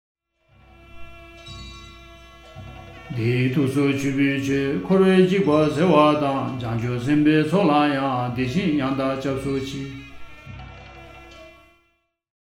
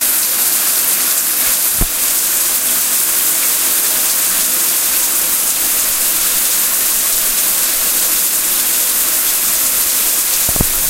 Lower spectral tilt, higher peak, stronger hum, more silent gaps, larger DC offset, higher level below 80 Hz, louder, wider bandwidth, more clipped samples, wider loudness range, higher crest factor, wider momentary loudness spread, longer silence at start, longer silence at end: first, -7 dB/octave vs 0.5 dB/octave; about the same, -2 dBFS vs 0 dBFS; neither; neither; neither; second, -48 dBFS vs -36 dBFS; second, -20 LUFS vs -11 LUFS; about the same, 15 kHz vs 16.5 kHz; neither; first, 11 LU vs 0 LU; first, 20 dB vs 14 dB; first, 24 LU vs 1 LU; first, 0.95 s vs 0 s; first, 0.9 s vs 0 s